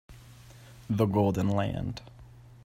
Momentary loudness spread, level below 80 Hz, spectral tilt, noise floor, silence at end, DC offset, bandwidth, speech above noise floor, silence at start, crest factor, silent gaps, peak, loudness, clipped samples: 16 LU; -54 dBFS; -8 dB/octave; -51 dBFS; 0.15 s; under 0.1%; 16 kHz; 24 dB; 0.1 s; 20 dB; none; -12 dBFS; -29 LUFS; under 0.1%